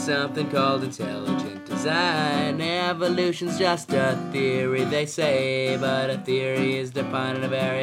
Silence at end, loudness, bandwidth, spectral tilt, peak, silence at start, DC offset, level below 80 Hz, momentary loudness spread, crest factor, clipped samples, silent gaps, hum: 0 s; -24 LUFS; 16 kHz; -5 dB/octave; -6 dBFS; 0 s; under 0.1%; -72 dBFS; 5 LU; 18 dB; under 0.1%; none; none